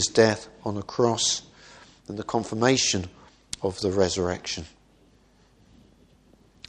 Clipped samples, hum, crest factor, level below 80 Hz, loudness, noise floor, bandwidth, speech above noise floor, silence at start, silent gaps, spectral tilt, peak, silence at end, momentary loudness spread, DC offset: under 0.1%; none; 22 dB; -56 dBFS; -25 LUFS; -59 dBFS; 12 kHz; 34 dB; 0 s; none; -3.5 dB/octave; -4 dBFS; 2 s; 17 LU; under 0.1%